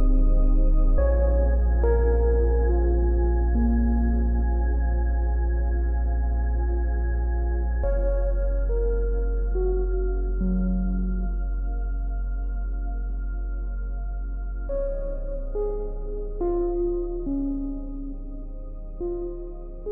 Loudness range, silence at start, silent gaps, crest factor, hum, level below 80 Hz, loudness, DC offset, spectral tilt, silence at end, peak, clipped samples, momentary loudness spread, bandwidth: 9 LU; 0 s; none; 12 dB; none; -24 dBFS; -26 LUFS; under 0.1%; -14.5 dB/octave; 0 s; -10 dBFS; under 0.1%; 11 LU; 1.8 kHz